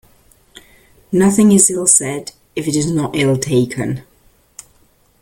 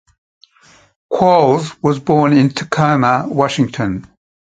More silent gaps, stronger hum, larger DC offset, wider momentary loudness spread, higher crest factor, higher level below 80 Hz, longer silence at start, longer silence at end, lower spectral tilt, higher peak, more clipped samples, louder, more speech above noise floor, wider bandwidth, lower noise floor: neither; neither; neither; first, 14 LU vs 10 LU; about the same, 16 dB vs 16 dB; about the same, -50 dBFS vs -50 dBFS; about the same, 1.1 s vs 1.1 s; first, 1.2 s vs 0.35 s; second, -4.5 dB/octave vs -6.5 dB/octave; about the same, 0 dBFS vs 0 dBFS; neither; about the same, -14 LUFS vs -14 LUFS; first, 40 dB vs 36 dB; first, 17 kHz vs 9.2 kHz; first, -54 dBFS vs -49 dBFS